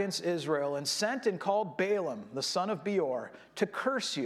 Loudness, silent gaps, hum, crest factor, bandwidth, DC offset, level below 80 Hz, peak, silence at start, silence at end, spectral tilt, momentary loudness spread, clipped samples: -32 LUFS; none; none; 18 dB; 15.5 kHz; under 0.1%; -80 dBFS; -14 dBFS; 0 s; 0 s; -3.5 dB/octave; 5 LU; under 0.1%